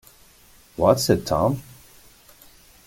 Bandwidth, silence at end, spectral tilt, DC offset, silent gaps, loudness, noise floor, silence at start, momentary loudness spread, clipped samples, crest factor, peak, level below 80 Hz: 17 kHz; 1.25 s; -5.5 dB/octave; under 0.1%; none; -21 LUFS; -53 dBFS; 0.8 s; 13 LU; under 0.1%; 22 dB; -2 dBFS; -48 dBFS